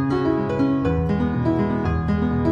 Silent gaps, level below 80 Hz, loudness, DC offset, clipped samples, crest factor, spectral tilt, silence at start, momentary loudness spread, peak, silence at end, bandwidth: none; -34 dBFS; -21 LUFS; under 0.1%; under 0.1%; 12 dB; -9.5 dB/octave; 0 s; 1 LU; -8 dBFS; 0 s; 7.2 kHz